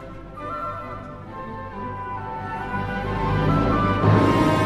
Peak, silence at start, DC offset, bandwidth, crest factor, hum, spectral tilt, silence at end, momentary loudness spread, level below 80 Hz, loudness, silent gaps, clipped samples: -6 dBFS; 0 s; under 0.1%; 12.5 kHz; 18 dB; 50 Hz at -40 dBFS; -7.5 dB/octave; 0 s; 17 LU; -36 dBFS; -23 LUFS; none; under 0.1%